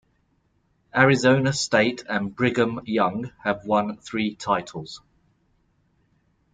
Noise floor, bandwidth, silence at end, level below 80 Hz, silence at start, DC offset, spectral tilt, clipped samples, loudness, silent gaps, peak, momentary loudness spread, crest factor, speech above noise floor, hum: -67 dBFS; 9.4 kHz; 1.55 s; -60 dBFS; 0.95 s; under 0.1%; -5 dB/octave; under 0.1%; -23 LUFS; none; -2 dBFS; 10 LU; 22 dB; 45 dB; none